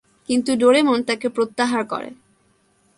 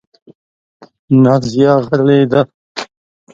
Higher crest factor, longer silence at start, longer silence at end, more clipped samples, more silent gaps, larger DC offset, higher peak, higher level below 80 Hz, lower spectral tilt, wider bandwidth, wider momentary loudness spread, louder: about the same, 18 dB vs 14 dB; second, 0.3 s vs 1.1 s; first, 0.85 s vs 0.5 s; neither; second, none vs 2.54-2.75 s; neither; second, -4 dBFS vs 0 dBFS; second, -64 dBFS vs -52 dBFS; second, -3.5 dB/octave vs -7.5 dB/octave; first, 11.5 kHz vs 7.6 kHz; second, 13 LU vs 16 LU; second, -19 LUFS vs -12 LUFS